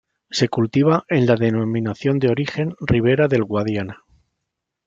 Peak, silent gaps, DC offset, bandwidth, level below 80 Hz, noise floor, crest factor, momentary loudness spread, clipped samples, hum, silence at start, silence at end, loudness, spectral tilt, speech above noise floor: -4 dBFS; none; under 0.1%; 7.8 kHz; -48 dBFS; -80 dBFS; 16 dB; 8 LU; under 0.1%; none; 0.3 s; 0.9 s; -19 LUFS; -7 dB/octave; 61 dB